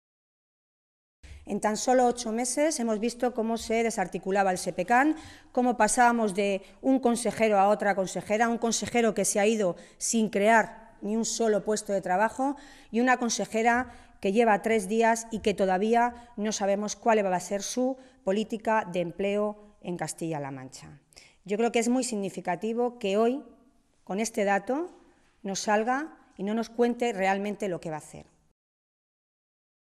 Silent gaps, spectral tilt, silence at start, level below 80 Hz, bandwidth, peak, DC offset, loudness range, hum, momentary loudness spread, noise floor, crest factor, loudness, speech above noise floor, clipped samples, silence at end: none; -4 dB/octave; 1.25 s; -60 dBFS; 13.5 kHz; -10 dBFS; under 0.1%; 6 LU; none; 11 LU; -63 dBFS; 18 dB; -27 LUFS; 36 dB; under 0.1%; 1.7 s